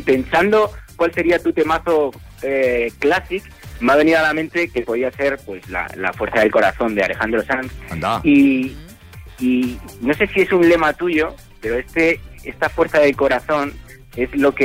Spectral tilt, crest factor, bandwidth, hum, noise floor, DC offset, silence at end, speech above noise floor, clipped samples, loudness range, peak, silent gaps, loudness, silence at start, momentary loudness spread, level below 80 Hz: -6 dB/octave; 14 dB; 16 kHz; none; -38 dBFS; under 0.1%; 0 s; 21 dB; under 0.1%; 2 LU; -4 dBFS; none; -18 LUFS; 0 s; 11 LU; -40 dBFS